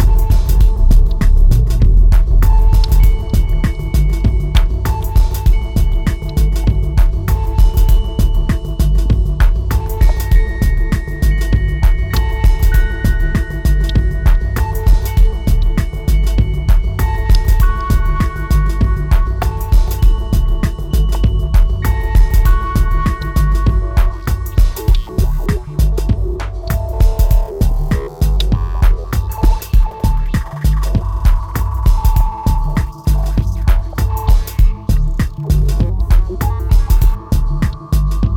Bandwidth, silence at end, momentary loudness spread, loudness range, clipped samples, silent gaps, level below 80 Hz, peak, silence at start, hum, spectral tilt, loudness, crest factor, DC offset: 16.5 kHz; 0 s; 5 LU; 3 LU; under 0.1%; none; -12 dBFS; -2 dBFS; 0 s; none; -6.5 dB/octave; -16 LUFS; 10 dB; under 0.1%